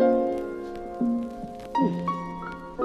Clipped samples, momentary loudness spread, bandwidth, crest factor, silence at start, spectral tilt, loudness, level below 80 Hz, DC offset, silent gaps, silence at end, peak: under 0.1%; 11 LU; 10.5 kHz; 18 dB; 0 s; -8.5 dB/octave; -29 LUFS; -52 dBFS; under 0.1%; none; 0 s; -10 dBFS